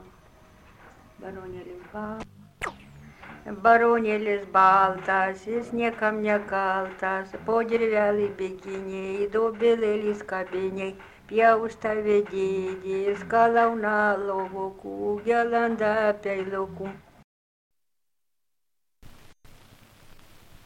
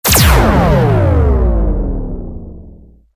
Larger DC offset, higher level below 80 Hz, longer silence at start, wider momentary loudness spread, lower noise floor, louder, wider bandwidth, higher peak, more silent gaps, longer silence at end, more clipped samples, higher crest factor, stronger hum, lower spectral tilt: neither; second, -58 dBFS vs -16 dBFS; about the same, 0 s vs 0.05 s; about the same, 17 LU vs 18 LU; first, -86 dBFS vs -38 dBFS; second, -25 LUFS vs -12 LUFS; second, 11 kHz vs 16 kHz; second, -6 dBFS vs 0 dBFS; first, 17.24-17.71 s vs none; second, 0.15 s vs 0.45 s; neither; first, 20 dB vs 12 dB; neither; about the same, -6 dB/octave vs -5 dB/octave